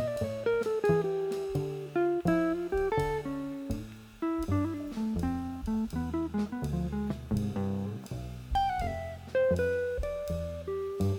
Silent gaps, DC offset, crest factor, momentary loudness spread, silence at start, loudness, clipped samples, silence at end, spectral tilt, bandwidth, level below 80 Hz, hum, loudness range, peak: none; under 0.1%; 18 dB; 9 LU; 0 s; -32 LUFS; under 0.1%; 0 s; -7.5 dB/octave; 18 kHz; -44 dBFS; none; 4 LU; -14 dBFS